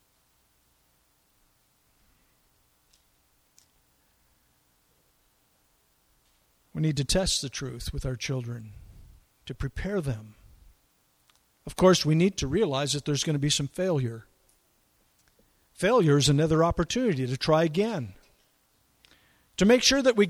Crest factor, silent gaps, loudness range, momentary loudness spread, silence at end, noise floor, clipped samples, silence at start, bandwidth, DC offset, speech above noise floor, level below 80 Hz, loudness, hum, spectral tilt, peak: 22 dB; none; 10 LU; 18 LU; 0 s; -68 dBFS; under 0.1%; 6.75 s; 15 kHz; under 0.1%; 43 dB; -46 dBFS; -25 LUFS; none; -4.5 dB/octave; -8 dBFS